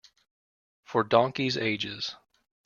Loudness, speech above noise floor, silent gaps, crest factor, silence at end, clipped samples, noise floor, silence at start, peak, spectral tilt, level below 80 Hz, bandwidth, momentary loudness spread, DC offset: -27 LUFS; over 63 dB; none; 24 dB; 0.5 s; under 0.1%; under -90 dBFS; 0.9 s; -6 dBFS; -5 dB/octave; -68 dBFS; 7.2 kHz; 10 LU; under 0.1%